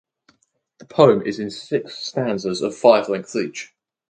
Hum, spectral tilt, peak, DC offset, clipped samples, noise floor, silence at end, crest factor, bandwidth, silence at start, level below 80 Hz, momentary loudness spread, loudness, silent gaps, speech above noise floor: none; -5.5 dB/octave; 0 dBFS; under 0.1%; under 0.1%; -65 dBFS; 0.45 s; 20 dB; 9.4 kHz; 0.95 s; -64 dBFS; 14 LU; -20 LUFS; none; 45 dB